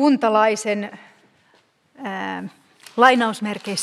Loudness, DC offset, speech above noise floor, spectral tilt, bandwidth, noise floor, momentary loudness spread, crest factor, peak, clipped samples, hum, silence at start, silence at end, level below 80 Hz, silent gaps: -19 LUFS; under 0.1%; 40 dB; -4 dB/octave; 13 kHz; -59 dBFS; 18 LU; 20 dB; 0 dBFS; under 0.1%; none; 0 s; 0 s; -70 dBFS; none